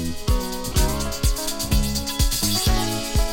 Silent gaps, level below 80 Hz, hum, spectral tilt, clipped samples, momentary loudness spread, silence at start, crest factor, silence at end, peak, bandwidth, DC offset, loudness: none; -24 dBFS; none; -3.5 dB/octave; under 0.1%; 5 LU; 0 s; 16 dB; 0 s; -6 dBFS; 17 kHz; under 0.1%; -23 LUFS